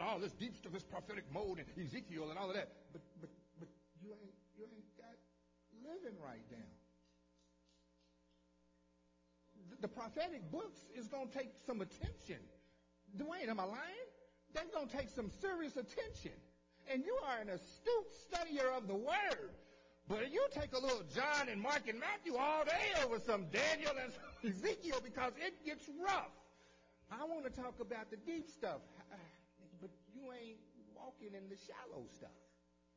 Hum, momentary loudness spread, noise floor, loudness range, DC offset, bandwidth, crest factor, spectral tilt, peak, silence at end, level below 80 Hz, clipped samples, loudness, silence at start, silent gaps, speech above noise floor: none; 21 LU; -76 dBFS; 19 LU; under 0.1%; 7.6 kHz; 20 dB; -4 dB/octave; -24 dBFS; 0.6 s; -68 dBFS; under 0.1%; -43 LUFS; 0 s; none; 32 dB